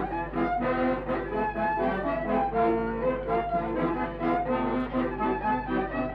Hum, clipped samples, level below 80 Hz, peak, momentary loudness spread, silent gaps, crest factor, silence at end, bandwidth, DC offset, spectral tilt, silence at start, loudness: 50 Hz at -45 dBFS; under 0.1%; -44 dBFS; -14 dBFS; 3 LU; none; 12 dB; 0 s; 5.4 kHz; under 0.1%; -9 dB/octave; 0 s; -28 LUFS